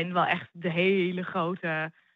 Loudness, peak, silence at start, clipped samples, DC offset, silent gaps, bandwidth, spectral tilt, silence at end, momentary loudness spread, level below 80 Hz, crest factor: -28 LUFS; -10 dBFS; 0 s; under 0.1%; under 0.1%; none; 5 kHz; -8 dB/octave; 0.25 s; 6 LU; -82 dBFS; 18 dB